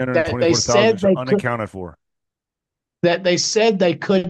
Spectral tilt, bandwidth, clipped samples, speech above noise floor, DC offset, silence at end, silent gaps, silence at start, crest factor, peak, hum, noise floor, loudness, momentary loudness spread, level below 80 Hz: -4.5 dB/octave; 9.8 kHz; under 0.1%; 68 dB; under 0.1%; 0 s; none; 0 s; 16 dB; -2 dBFS; none; -85 dBFS; -17 LUFS; 11 LU; -50 dBFS